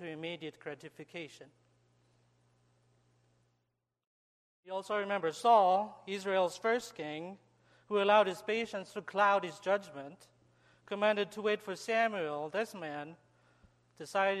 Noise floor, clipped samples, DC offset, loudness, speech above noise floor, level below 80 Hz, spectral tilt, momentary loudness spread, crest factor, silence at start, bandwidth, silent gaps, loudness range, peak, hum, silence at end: -84 dBFS; under 0.1%; under 0.1%; -33 LUFS; 50 dB; -82 dBFS; -4 dB/octave; 19 LU; 22 dB; 0 s; 13 kHz; 4.07-4.63 s; 14 LU; -14 dBFS; 60 Hz at -70 dBFS; 0 s